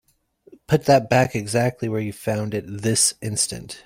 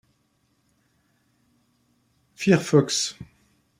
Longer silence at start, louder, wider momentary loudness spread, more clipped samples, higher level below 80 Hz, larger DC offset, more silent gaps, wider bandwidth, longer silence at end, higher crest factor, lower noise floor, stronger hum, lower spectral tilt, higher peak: second, 0.7 s vs 2.4 s; about the same, -21 LUFS vs -22 LUFS; about the same, 9 LU vs 11 LU; neither; first, -54 dBFS vs -64 dBFS; neither; neither; about the same, 16.5 kHz vs 15.5 kHz; second, 0.05 s vs 0.55 s; about the same, 18 dB vs 22 dB; second, -57 dBFS vs -69 dBFS; neither; about the same, -4 dB/octave vs -4.5 dB/octave; about the same, -4 dBFS vs -4 dBFS